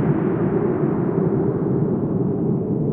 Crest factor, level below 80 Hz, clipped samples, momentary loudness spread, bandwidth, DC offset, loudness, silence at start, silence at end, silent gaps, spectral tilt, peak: 12 dB; -48 dBFS; under 0.1%; 2 LU; 3.2 kHz; under 0.1%; -21 LUFS; 0 s; 0 s; none; -13.5 dB/octave; -8 dBFS